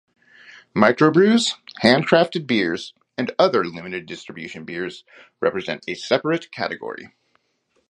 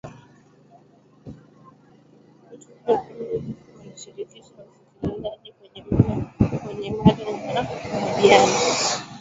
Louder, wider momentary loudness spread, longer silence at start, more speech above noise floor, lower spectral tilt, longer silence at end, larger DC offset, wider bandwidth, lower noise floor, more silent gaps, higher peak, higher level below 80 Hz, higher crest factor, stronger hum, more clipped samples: about the same, -20 LUFS vs -22 LUFS; second, 18 LU vs 27 LU; first, 0.55 s vs 0.05 s; first, 47 dB vs 32 dB; about the same, -5 dB/octave vs -5 dB/octave; first, 0.85 s vs 0 s; neither; first, 11 kHz vs 8 kHz; first, -68 dBFS vs -54 dBFS; neither; about the same, 0 dBFS vs 0 dBFS; second, -64 dBFS vs -44 dBFS; about the same, 22 dB vs 24 dB; neither; neither